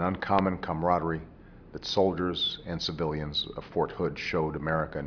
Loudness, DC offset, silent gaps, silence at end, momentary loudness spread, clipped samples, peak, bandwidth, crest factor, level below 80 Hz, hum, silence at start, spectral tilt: -29 LUFS; under 0.1%; none; 0 s; 7 LU; under 0.1%; -10 dBFS; 5.4 kHz; 20 dB; -50 dBFS; none; 0 s; -6 dB/octave